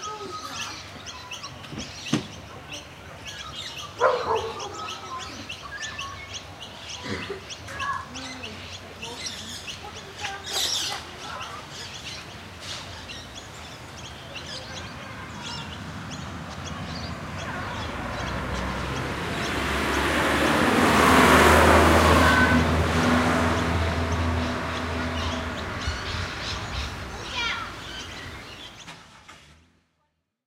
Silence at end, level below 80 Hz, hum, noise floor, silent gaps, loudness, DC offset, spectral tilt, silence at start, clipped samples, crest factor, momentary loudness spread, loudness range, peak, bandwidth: 0.95 s; -38 dBFS; none; -75 dBFS; none; -25 LUFS; under 0.1%; -4.5 dB/octave; 0 s; under 0.1%; 24 dB; 20 LU; 18 LU; -2 dBFS; 16 kHz